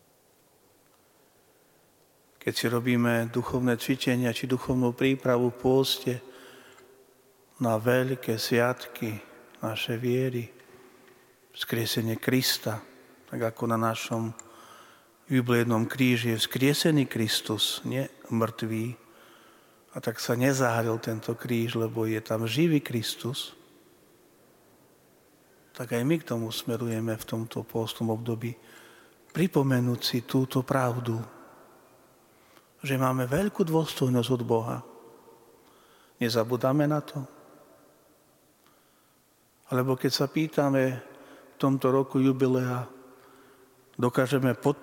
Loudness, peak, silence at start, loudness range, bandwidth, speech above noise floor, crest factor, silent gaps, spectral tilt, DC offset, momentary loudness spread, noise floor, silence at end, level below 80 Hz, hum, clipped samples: -28 LUFS; -8 dBFS; 2.45 s; 6 LU; 17 kHz; 37 dB; 20 dB; none; -5.5 dB/octave; under 0.1%; 11 LU; -64 dBFS; 0 s; -64 dBFS; none; under 0.1%